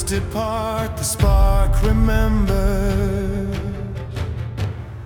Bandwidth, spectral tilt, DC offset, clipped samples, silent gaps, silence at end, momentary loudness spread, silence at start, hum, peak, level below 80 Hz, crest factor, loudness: 19.5 kHz; -6 dB/octave; under 0.1%; under 0.1%; none; 0 s; 10 LU; 0 s; none; -6 dBFS; -20 dBFS; 14 dB; -21 LUFS